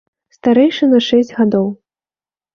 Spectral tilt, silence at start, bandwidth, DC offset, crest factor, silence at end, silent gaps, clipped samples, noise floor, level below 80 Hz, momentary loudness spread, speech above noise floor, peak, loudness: -6.5 dB/octave; 0.45 s; 7 kHz; under 0.1%; 14 dB; 0.8 s; none; under 0.1%; under -90 dBFS; -58 dBFS; 7 LU; over 78 dB; -2 dBFS; -14 LUFS